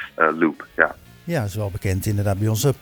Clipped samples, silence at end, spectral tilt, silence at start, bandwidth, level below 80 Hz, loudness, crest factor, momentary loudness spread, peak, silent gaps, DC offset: under 0.1%; 0.05 s; -6 dB/octave; 0 s; over 20 kHz; -46 dBFS; -22 LUFS; 22 dB; 7 LU; 0 dBFS; none; under 0.1%